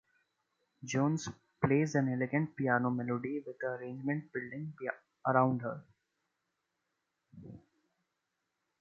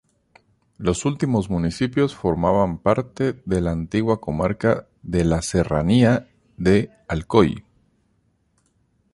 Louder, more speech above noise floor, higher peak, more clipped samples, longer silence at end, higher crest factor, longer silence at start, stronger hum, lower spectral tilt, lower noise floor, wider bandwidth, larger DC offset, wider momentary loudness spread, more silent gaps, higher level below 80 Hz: second, -34 LUFS vs -21 LUFS; first, 51 dB vs 45 dB; second, -12 dBFS vs -2 dBFS; neither; second, 1.25 s vs 1.55 s; about the same, 24 dB vs 20 dB; about the same, 0.8 s vs 0.8 s; neither; about the same, -7 dB/octave vs -6.5 dB/octave; first, -85 dBFS vs -65 dBFS; second, 7.6 kHz vs 11.5 kHz; neither; first, 15 LU vs 7 LU; neither; second, -72 dBFS vs -40 dBFS